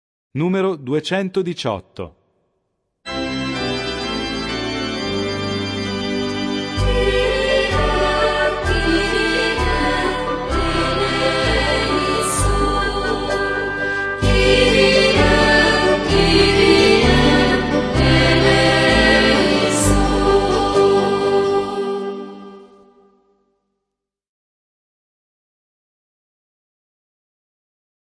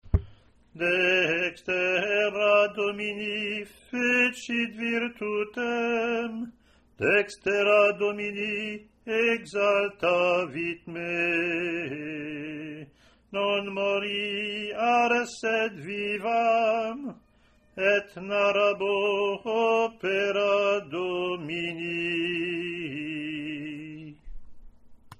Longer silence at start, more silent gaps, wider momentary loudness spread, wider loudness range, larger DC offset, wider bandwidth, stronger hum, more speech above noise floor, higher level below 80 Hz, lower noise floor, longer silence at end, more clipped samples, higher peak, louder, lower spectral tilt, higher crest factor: first, 0.35 s vs 0.05 s; neither; second, 10 LU vs 13 LU; first, 11 LU vs 5 LU; neither; second, 11 kHz vs 12.5 kHz; neither; first, 60 dB vs 35 dB; first, -28 dBFS vs -48 dBFS; first, -81 dBFS vs -61 dBFS; first, 5.4 s vs 0.05 s; neither; first, -2 dBFS vs -10 dBFS; first, -16 LUFS vs -26 LUFS; about the same, -4.5 dB/octave vs -5 dB/octave; about the same, 16 dB vs 18 dB